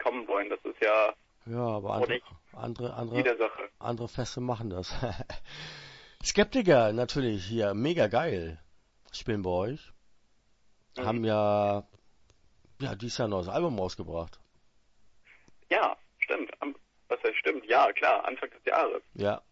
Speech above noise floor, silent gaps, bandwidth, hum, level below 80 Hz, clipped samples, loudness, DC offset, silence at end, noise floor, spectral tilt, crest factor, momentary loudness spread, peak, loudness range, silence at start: 35 dB; none; 8 kHz; none; -54 dBFS; under 0.1%; -30 LUFS; under 0.1%; 0.1 s; -64 dBFS; -5 dB/octave; 22 dB; 14 LU; -8 dBFS; 6 LU; 0 s